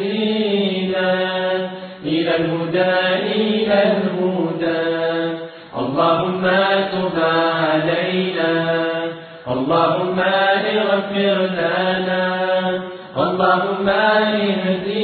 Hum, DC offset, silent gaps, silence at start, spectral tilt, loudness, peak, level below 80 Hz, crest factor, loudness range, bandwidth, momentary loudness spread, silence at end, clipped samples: none; under 0.1%; none; 0 s; -8.5 dB/octave; -18 LUFS; -4 dBFS; -58 dBFS; 14 dB; 1 LU; 4.6 kHz; 7 LU; 0 s; under 0.1%